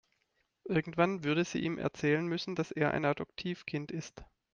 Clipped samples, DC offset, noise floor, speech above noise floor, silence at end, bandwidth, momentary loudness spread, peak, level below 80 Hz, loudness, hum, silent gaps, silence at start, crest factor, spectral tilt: under 0.1%; under 0.1%; -78 dBFS; 45 dB; 0.3 s; 7.4 kHz; 10 LU; -14 dBFS; -64 dBFS; -33 LUFS; none; none; 0.65 s; 20 dB; -6 dB/octave